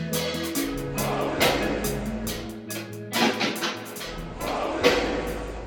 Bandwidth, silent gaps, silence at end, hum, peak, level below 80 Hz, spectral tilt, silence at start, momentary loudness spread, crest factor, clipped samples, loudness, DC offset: 19 kHz; none; 0 s; none; -4 dBFS; -42 dBFS; -3.5 dB/octave; 0 s; 12 LU; 22 dB; under 0.1%; -26 LUFS; under 0.1%